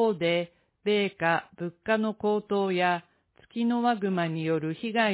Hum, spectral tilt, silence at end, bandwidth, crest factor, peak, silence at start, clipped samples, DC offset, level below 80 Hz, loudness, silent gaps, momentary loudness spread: none; -10 dB/octave; 0 s; 4 kHz; 16 dB; -12 dBFS; 0 s; under 0.1%; under 0.1%; -70 dBFS; -28 LUFS; none; 8 LU